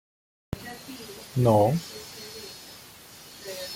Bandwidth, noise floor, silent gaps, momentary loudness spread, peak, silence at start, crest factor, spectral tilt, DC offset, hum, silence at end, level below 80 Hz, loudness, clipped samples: 17 kHz; -48 dBFS; none; 23 LU; -8 dBFS; 0.5 s; 20 dB; -6 dB/octave; under 0.1%; none; 0 s; -56 dBFS; -26 LUFS; under 0.1%